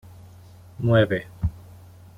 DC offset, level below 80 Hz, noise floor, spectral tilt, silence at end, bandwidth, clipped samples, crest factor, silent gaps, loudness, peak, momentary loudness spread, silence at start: under 0.1%; -42 dBFS; -47 dBFS; -8.5 dB/octave; 0.6 s; 5.2 kHz; under 0.1%; 20 dB; none; -23 LUFS; -6 dBFS; 11 LU; 0.8 s